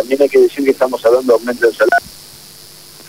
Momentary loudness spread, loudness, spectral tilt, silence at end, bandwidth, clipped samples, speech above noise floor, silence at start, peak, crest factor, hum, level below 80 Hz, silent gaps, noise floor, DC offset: 5 LU; -13 LUFS; -4 dB/octave; 0.95 s; 16 kHz; under 0.1%; 26 dB; 0 s; 0 dBFS; 14 dB; none; -56 dBFS; none; -38 dBFS; 0.3%